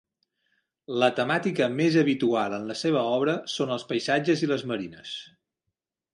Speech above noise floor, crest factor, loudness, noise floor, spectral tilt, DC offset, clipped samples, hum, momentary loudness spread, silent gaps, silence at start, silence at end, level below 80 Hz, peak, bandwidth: 58 dB; 18 dB; -26 LUFS; -84 dBFS; -5.5 dB/octave; under 0.1%; under 0.1%; none; 11 LU; none; 0.9 s; 0.85 s; -72 dBFS; -8 dBFS; 11.5 kHz